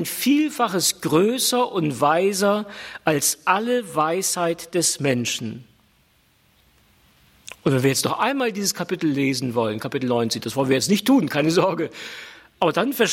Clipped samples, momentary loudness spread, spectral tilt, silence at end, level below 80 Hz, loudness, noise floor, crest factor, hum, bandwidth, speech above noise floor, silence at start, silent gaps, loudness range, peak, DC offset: under 0.1%; 8 LU; -4 dB/octave; 0 s; -64 dBFS; -21 LUFS; -60 dBFS; 18 dB; none; 16.5 kHz; 39 dB; 0 s; none; 5 LU; -4 dBFS; under 0.1%